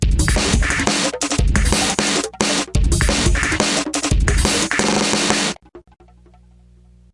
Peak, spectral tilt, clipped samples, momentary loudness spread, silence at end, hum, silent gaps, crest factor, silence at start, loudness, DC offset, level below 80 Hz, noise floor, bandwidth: 0 dBFS; -3.5 dB/octave; under 0.1%; 3 LU; 1.35 s; 60 Hz at -45 dBFS; none; 18 dB; 0 s; -17 LUFS; under 0.1%; -22 dBFS; -48 dBFS; 11.5 kHz